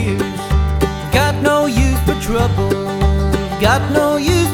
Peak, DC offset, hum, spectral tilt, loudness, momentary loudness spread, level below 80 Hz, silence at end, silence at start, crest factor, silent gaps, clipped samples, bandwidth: 0 dBFS; under 0.1%; none; -5.5 dB/octave; -16 LUFS; 4 LU; -20 dBFS; 0 s; 0 s; 14 dB; none; under 0.1%; 18.5 kHz